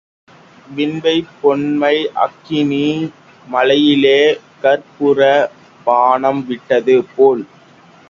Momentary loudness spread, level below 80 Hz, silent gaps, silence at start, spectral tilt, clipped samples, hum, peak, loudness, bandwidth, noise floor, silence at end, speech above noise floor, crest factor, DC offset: 11 LU; -60 dBFS; none; 0.7 s; -6 dB/octave; under 0.1%; none; 0 dBFS; -14 LUFS; 7.2 kHz; -44 dBFS; 0.65 s; 31 dB; 14 dB; under 0.1%